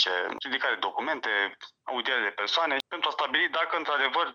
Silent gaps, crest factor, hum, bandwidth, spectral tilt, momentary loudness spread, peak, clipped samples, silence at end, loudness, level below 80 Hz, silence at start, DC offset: none; 20 dB; none; 13 kHz; -1 dB/octave; 5 LU; -10 dBFS; under 0.1%; 0 s; -27 LUFS; -80 dBFS; 0 s; under 0.1%